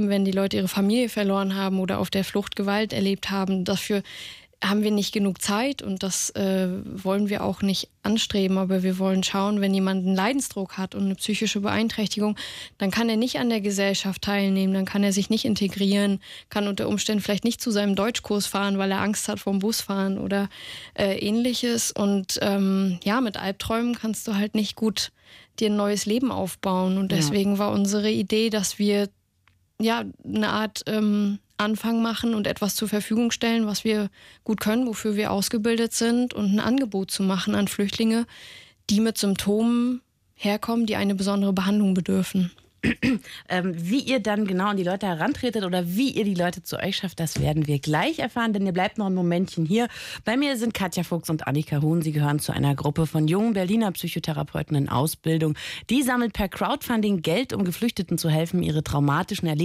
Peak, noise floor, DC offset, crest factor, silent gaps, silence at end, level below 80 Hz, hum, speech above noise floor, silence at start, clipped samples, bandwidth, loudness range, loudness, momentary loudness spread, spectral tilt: -10 dBFS; -64 dBFS; under 0.1%; 14 dB; none; 0 s; -54 dBFS; none; 40 dB; 0 s; under 0.1%; 16 kHz; 2 LU; -24 LUFS; 5 LU; -5 dB/octave